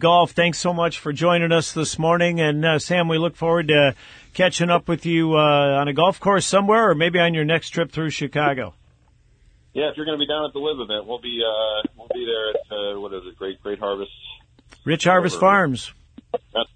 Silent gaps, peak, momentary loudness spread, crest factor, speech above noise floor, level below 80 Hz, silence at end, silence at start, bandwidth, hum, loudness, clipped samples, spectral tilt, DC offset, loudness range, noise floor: none; -2 dBFS; 15 LU; 18 dB; 37 dB; -54 dBFS; 0.1 s; 0 s; 9.4 kHz; none; -20 LUFS; under 0.1%; -4.5 dB/octave; under 0.1%; 8 LU; -57 dBFS